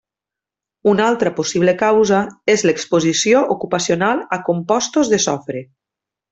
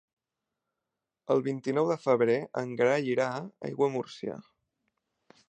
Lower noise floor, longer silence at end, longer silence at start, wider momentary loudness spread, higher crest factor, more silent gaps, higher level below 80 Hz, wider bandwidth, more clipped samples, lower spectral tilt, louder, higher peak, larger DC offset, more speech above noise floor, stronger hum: about the same, -87 dBFS vs -87 dBFS; second, 0.65 s vs 1.1 s; second, 0.85 s vs 1.3 s; second, 6 LU vs 13 LU; second, 14 dB vs 20 dB; neither; first, -58 dBFS vs -78 dBFS; about the same, 8.4 kHz vs 9 kHz; neither; second, -4 dB/octave vs -6.5 dB/octave; first, -16 LUFS vs -29 LUFS; first, -2 dBFS vs -10 dBFS; neither; first, 71 dB vs 59 dB; neither